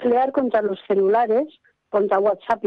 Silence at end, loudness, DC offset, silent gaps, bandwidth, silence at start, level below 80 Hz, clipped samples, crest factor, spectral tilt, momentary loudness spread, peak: 0 s; -20 LUFS; under 0.1%; none; 5.4 kHz; 0 s; -64 dBFS; under 0.1%; 12 dB; -8 dB/octave; 5 LU; -8 dBFS